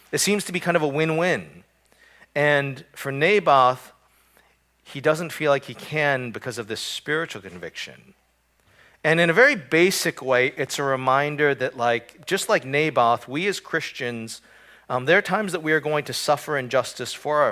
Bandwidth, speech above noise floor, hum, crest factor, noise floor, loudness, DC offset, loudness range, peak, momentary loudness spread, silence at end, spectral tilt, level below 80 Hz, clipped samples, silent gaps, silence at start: 16 kHz; 41 dB; none; 20 dB; -64 dBFS; -22 LUFS; under 0.1%; 6 LU; -2 dBFS; 13 LU; 0 s; -4 dB/octave; -66 dBFS; under 0.1%; none; 0.1 s